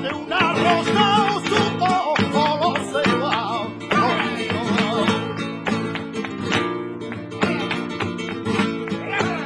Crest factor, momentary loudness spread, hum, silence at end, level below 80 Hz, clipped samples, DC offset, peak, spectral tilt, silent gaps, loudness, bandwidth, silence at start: 18 dB; 9 LU; none; 0 s; -56 dBFS; under 0.1%; under 0.1%; -4 dBFS; -5 dB/octave; none; -21 LUFS; 11 kHz; 0 s